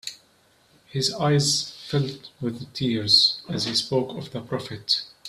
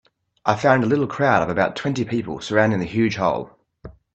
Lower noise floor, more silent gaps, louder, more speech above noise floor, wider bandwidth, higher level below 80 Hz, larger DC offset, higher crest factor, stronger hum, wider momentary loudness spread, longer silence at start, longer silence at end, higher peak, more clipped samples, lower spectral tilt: first, -60 dBFS vs -44 dBFS; neither; second, -23 LUFS vs -20 LUFS; first, 36 dB vs 24 dB; first, 14 kHz vs 8.4 kHz; second, -60 dBFS vs -54 dBFS; neither; about the same, 20 dB vs 20 dB; neither; first, 15 LU vs 8 LU; second, 0.05 s vs 0.45 s; second, 0 s vs 0.25 s; second, -4 dBFS vs 0 dBFS; neither; second, -4 dB/octave vs -6.5 dB/octave